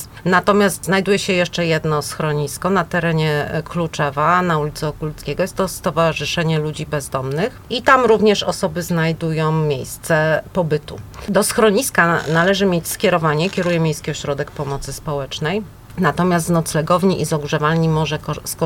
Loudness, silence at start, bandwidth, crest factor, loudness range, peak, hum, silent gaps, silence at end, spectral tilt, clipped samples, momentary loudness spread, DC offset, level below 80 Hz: -18 LUFS; 0 s; 17 kHz; 18 dB; 4 LU; 0 dBFS; none; none; 0 s; -5 dB/octave; under 0.1%; 9 LU; under 0.1%; -42 dBFS